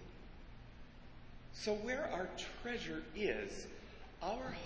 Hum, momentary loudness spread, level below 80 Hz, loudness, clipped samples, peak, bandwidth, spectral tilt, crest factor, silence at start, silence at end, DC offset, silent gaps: none; 19 LU; -58 dBFS; -42 LUFS; under 0.1%; -24 dBFS; 8 kHz; -4 dB/octave; 20 dB; 0 s; 0 s; under 0.1%; none